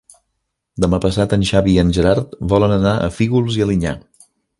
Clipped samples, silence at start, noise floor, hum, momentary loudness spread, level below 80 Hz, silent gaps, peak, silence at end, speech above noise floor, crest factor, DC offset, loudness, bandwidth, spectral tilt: under 0.1%; 0.75 s; -73 dBFS; none; 7 LU; -32 dBFS; none; 0 dBFS; 0.6 s; 58 dB; 16 dB; under 0.1%; -16 LUFS; 11.5 kHz; -7 dB/octave